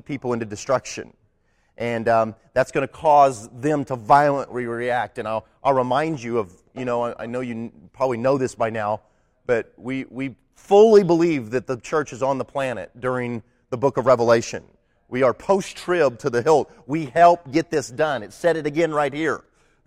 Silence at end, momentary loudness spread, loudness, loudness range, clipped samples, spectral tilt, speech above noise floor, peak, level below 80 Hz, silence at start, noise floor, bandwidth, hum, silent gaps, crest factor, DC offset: 0.45 s; 15 LU; -21 LUFS; 5 LU; under 0.1%; -6 dB/octave; 44 dB; -4 dBFS; -56 dBFS; 0.1 s; -64 dBFS; 13 kHz; none; none; 18 dB; under 0.1%